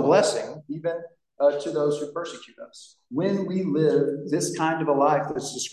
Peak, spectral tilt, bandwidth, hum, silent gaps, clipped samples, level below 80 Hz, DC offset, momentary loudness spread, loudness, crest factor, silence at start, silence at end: -6 dBFS; -5 dB/octave; 12.5 kHz; none; none; under 0.1%; -72 dBFS; under 0.1%; 15 LU; -25 LUFS; 18 dB; 0 s; 0 s